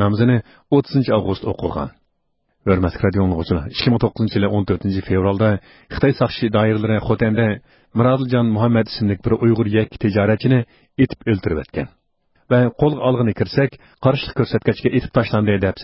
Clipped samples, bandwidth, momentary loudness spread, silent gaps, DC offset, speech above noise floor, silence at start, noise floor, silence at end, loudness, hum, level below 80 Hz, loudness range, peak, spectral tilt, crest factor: under 0.1%; 5.8 kHz; 7 LU; none; under 0.1%; 50 dB; 0 s; -68 dBFS; 0 s; -18 LUFS; none; -38 dBFS; 2 LU; 0 dBFS; -12 dB/octave; 16 dB